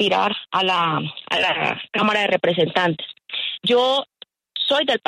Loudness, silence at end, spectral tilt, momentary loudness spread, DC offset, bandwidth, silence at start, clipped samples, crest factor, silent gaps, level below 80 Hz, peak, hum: -20 LUFS; 0.1 s; -4.5 dB/octave; 8 LU; under 0.1%; 12.5 kHz; 0 s; under 0.1%; 14 dB; none; -66 dBFS; -6 dBFS; none